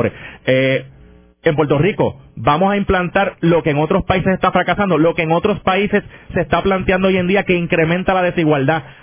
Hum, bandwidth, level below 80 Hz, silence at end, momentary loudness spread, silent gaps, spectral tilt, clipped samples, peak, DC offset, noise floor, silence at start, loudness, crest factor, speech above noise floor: none; 3.6 kHz; -38 dBFS; 0.1 s; 6 LU; none; -10.5 dB/octave; under 0.1%; 0 dBFS; under 0.1%; -45 dBFS; 0 s; -16 LUFS; 16 dB; 29 dB